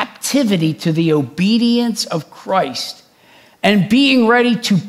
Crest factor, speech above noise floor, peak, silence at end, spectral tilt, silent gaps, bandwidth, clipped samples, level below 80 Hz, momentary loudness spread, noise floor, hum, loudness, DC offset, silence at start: 16 dB; 33 dB; 0 dBFS; 0 s; -5 dB/octave; none; 15.5 kHz; under 0.1%; -60 dBFS; 10 LU; -48 dBFS; none; -15 LUFS; under 0.1%; 0 s